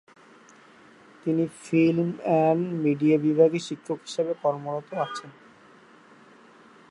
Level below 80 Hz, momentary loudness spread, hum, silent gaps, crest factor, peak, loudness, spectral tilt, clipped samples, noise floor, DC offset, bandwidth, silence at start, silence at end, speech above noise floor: -74 dBFS; 11 LU; none; none; 20 dB; -6 dBFS; -25 LUFS; -7 dB/octave; under 0.1%; -53 dBFS; under 0.1%; 11 kHz; 1.25 s; 1.6 s; 29 dB